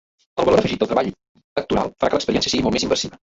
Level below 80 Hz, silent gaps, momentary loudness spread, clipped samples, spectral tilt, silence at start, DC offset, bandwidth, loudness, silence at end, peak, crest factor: -44 dBFS; 1.29-1.35 s, 1.44-1.56 s; 10 LU; under 0.1%; -4.5 dB/octave; 0.35 s; under 0.1%; 8 kHz; -20 LUFS; 0.15 s; -4 dBFS; 18 dB